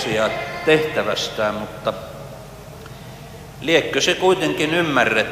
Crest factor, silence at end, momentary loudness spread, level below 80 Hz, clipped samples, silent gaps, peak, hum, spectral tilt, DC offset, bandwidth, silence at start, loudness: 18 dB; 0 s; 21 LU; -48 dBFS; under 0.1%; none; -2 dBFS; none; -4 dB/octave; under 0.1%; 15.5 kHz; 0 s; -19 LUFS